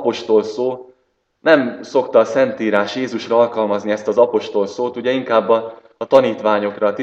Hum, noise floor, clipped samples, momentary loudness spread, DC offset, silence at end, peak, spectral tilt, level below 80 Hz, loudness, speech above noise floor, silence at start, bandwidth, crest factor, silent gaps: none; -65 dBFS; under 0.1%; 8 LU; under 0.1%; 0 s; 0 dBFS; -5.5 dB/octave; -66 dBFS; -17 LUFS; 48 dB; 0 s; 8 kHz; 16 dB; none